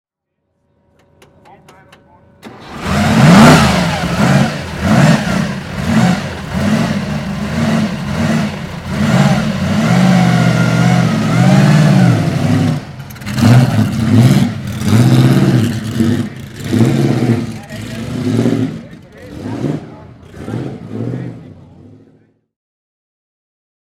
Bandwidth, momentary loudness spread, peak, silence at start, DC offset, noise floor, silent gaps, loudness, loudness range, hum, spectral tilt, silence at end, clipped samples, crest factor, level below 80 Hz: 15.5 kHz; 15 LU; 0 dBFS; 2.45 s; under 0.1%; -70 dBFS; none; -12 LUFS; 14 LU; none; -6.5 dB/octave; 2.3 s; 0.2%; 14 dB; -36 dBFS